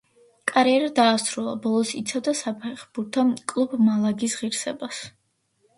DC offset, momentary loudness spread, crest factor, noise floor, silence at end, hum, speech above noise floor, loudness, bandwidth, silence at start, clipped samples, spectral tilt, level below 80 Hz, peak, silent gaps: under 0.1%; 14 LU; 20 dB; -68 dBFS; 0.7 s; none; 45 dB; -23 LUFS; 11.5 kHz; 0.45 s; under 0.1%; -4 dB/octave; -70 dBFS; -4 dBFS; none